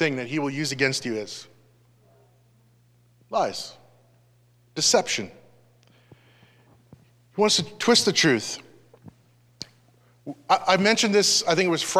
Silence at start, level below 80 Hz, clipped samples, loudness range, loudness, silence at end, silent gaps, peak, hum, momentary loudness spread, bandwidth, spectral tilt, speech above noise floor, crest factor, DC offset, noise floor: 0 s; -68 dBFS; under 0.1%; 9 LU; -22 LUFS; 0 s; none; -4 dBFS; 60 Hz at -60 dBFS; 21 LU; 15 kHz; -2.5 dB/octave; 37 dB; 22 dB; under 0.1%; -60 dBFS